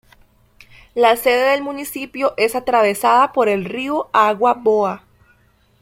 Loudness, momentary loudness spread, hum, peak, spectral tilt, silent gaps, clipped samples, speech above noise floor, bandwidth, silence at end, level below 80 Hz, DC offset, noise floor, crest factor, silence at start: -17 LUFS; 11 LU; none; -2 dBFS; -4 dB/octave; none; under 0.1%; 40 dB; 16.5 kHz; 0.85 s; -56 dBFS; under 0.1%; -56 dBFS; 16 dB; 0.95 s